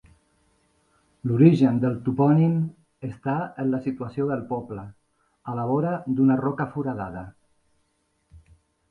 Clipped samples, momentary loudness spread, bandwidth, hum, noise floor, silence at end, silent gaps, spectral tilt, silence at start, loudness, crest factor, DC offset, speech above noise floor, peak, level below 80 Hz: under 0.1%; 19 LU; 6.6 kHz; none; -71 dBFS; 0.5 s; none; -10.5 dB/octave; 1.25 s; -24 LUFS; 22 dB; under 0.1%; 48 dB; -4 dBFS; -58 dBFS